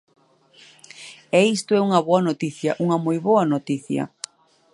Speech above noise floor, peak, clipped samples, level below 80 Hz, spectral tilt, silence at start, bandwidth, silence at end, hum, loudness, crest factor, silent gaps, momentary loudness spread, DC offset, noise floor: 33 dB; -2 dBFS; under 0.1%; -72 dBFS; -6 dB/octave; 1 s; 11.5 kHz; 0.65 s; none; -21 LUFS; 20 dB; none; 18 LU; under 0.1%; -53 dBFS